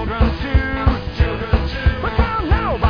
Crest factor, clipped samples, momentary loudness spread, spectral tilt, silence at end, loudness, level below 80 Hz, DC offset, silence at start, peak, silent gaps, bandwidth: 14 dB; under 0.1%; 3 LU; -8.5 dB/octave; 0 s; -19 LUFS; -20 dBFS; 0.4%; 0 s; -2 dBFS; none; 5.4 kHz